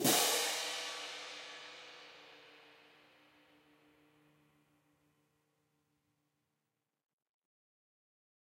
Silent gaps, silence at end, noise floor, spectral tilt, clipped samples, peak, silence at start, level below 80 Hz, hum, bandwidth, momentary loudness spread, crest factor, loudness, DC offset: none; 5.7 s; -88 dBFS; -1 dB/octave; under 0.1%; -18 dBFS; 0 s; under -90 dBFS; none; 16 kHz; 27 LU; 26 dB; -35 LUFS; under 0.1%